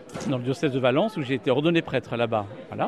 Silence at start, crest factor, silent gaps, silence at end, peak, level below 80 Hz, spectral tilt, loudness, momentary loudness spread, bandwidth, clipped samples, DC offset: 0 s; 18 dB; none; 0 s; -8 dBFS; -62 dBFS; -6.5 dB/octave; -25 LUFS; 7 LU; 12.5 kHz; under 0.1%; under 0.1%